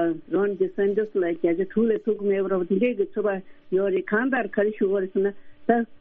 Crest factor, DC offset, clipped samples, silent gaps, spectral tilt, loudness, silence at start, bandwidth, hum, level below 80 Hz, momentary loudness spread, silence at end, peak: 18 dB; under 0.1%; under 0.1%; none; -6.5 dB/octave; -24 LUFS; 0 s; 3.7 kHz; none; -62 dBFS; 3 LU; 0.05 s; -6 dBFS